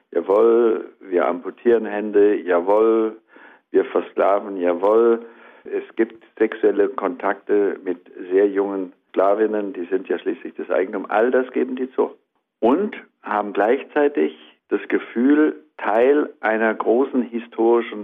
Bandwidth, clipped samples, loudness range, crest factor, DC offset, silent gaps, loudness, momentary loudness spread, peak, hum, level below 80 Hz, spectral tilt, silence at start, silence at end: 3.8 kHz; under 0.1%; 3 LU; 14 dB; under 0.1%; none; -20 LUFS; 10 LU; -6 dBFS; none; -70 dBFS; -8 dB/octave; 0.1 s; 0 s